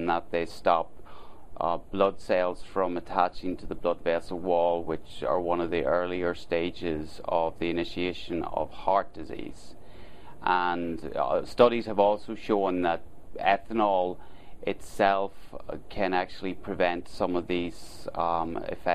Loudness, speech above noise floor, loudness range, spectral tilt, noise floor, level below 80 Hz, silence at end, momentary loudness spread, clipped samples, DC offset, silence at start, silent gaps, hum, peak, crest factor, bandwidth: -28 LUFS; 20 dB; 4 LU; -6 dB/octave; -48 dBFS; -50 dBFS; 0 s; 11 LU; under 0.1%; 1%; 0 s; none; none; -4 dBFS; 24 dB; 13.5 kHz